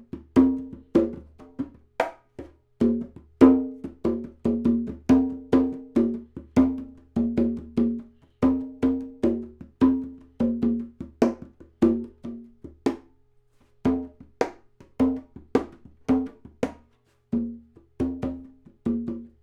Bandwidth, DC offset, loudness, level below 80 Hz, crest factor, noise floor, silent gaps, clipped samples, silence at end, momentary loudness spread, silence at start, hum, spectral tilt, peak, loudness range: 7.8 kHz; under 0.1%; -26 LUFS; -46 dBFS; 24 dB; -63 dBFS; none; under 0.1%; 0.15 s; 17 LU; 0.15 s; none; -8 dB/octave; -2 dBFS; 7 LU